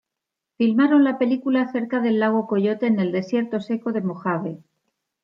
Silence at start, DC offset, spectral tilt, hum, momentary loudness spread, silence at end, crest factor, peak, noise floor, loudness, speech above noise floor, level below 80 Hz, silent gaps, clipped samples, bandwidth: 0.6 s; under 0.1%; -8.5 dB/octave; none; 9 LU; 0.7 s; 14 dB; -8 dBFS; -84 dBFS; -21 LUFS; 64 dB; -74 dBFS; none; under 0.1%; 6.6 kHz